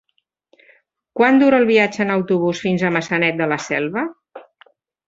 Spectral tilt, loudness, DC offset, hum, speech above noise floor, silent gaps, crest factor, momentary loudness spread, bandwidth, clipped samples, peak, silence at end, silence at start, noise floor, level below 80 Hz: -6 dB/octave; -17 LUFS; under 0.1%; none; 44 dB; none; 18 dB; 10 LU; 7.8 kHz; under 0.1%; -2 dBFS; 0.65 s; 1.15 s; -61 dBFS; -62 dBFS